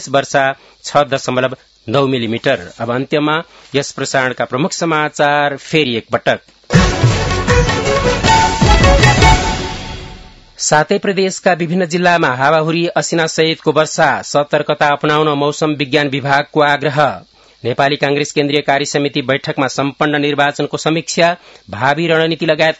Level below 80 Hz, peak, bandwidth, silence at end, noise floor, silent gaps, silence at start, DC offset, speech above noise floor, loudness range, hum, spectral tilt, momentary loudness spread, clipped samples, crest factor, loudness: -26 dBFS; 0 dBFS; 12 kHz; 0.05 s; -36 dBFS; none; 0 s; under 0.1%; 22 dB; 4 LU; none; -4.5 dB/octave; 8 LU; 0.1%; 14 dB; -14 LUFS